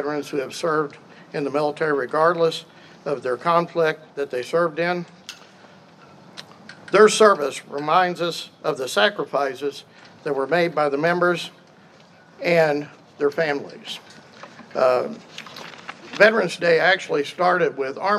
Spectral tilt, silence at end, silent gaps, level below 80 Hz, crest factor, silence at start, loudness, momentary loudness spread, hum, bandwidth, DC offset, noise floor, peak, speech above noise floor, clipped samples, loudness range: -4 dB/octave; 0 s; none; -78 dBFS; 22 dB; 0 s; -21 LUFS; 20 LU; none; 13.5 kHz; under 0.1%; -50 dBFS; 0 dBFS; 29 dB; under 0.1%; 5 LU